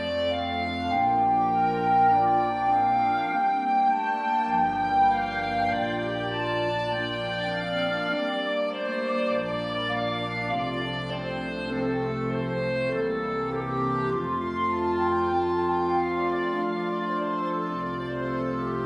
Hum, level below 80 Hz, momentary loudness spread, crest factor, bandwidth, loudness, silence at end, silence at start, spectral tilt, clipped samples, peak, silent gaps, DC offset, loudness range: none; -54 dBFS; 6 LU; 14 dB; 11 kHz; -26 LUFS; 0 s; 0 s; -7 dB/octave; under 0.1%; -12 dBFS; none; under 0.1%; 5 LU